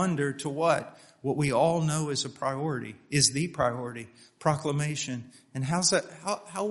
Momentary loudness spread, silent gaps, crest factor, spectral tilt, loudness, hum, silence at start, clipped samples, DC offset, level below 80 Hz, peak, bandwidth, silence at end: 12 LU; none; 22 dB; -4 dB/octave; -28 LUFS; none; 0 s; under 0.1%; under 0.1%; -62 dBFS; -8 dBFS; 11.5 kHz; 0 s